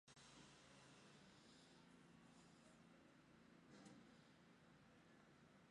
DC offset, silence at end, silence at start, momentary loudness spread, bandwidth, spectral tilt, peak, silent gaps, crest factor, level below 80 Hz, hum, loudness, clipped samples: under 0.1%; 0 s; 0.05 s; 4 LU; 11 kHz; -4 dB/octave; -52 dBFS; none; 18 dB; -88 dBFS; none; -68 LUFS; under 0.1%